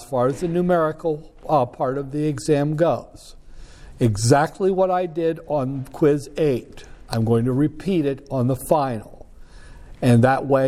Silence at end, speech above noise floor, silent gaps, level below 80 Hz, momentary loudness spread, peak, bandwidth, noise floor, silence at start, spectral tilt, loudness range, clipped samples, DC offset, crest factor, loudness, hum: 0 s; 21 dB; none; -44 dBFS; 8 LU; -4 dBFS; 15 kHz; -41 dBFS; 0 s; -7 dB/octave; 2 LU; under 0.1%; under 0.1%; 18 dB; -21 LUFS; none